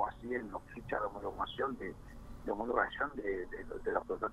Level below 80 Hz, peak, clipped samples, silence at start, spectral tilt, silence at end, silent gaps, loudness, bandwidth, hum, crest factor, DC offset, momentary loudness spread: -54 dBFS; -16 dBFS; under 0.1%; 0 s; -6.5 dB/octave; 0 s; none; -38 LUFS; 13.5 kHz; none; 24 dB; under 0.1%; 12 LU